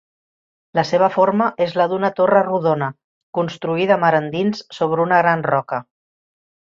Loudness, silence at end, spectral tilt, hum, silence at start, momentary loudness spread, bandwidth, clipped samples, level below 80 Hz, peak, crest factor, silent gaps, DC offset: -18 LUFS; 0.95 s; -7 dB/octave; none; 0.75 s; 9 LU; 7.4 kHz; under 0.1%; -64 dBFS; -2 dBFS; 16 dB; 3.04-3.33 s; under 0.1%